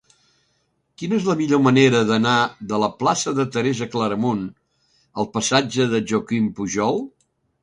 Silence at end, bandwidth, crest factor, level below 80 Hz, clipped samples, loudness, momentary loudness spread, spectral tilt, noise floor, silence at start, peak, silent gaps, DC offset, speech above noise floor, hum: 0.55 s; 11 kHz; 18 dB; -58 dBFS; under 0.1%; -20 LUFS; 11 LU; -5 dB/octave; -68 dBFS; 1 s; -2 dBFS; none; under 0.1%; 49 dB; none